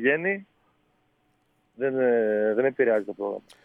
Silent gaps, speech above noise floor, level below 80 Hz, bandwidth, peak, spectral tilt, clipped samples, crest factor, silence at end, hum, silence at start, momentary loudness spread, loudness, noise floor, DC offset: none; 44 dB; -78 dBFS; 5.4 kHz; -8 dBFS; -7.5 dB/octave; under 0.1%; 18 dB; 0.25 s; none; 0 s; 10 LU; -25 LUFS; -69 dBFS; under 0.1%